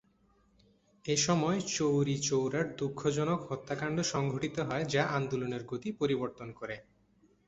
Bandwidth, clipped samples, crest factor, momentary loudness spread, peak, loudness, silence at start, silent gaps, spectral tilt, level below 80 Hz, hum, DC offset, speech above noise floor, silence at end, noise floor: 8.4 kHz; under 0.1%; 20 dB; 11 LU; -14 dBFS; -32 LUFS; 1.05 s; none; -4.5 dB/octave; -64 dBFS; none; under 0.1%; 36 dB; 0.65 s; -69 dBFS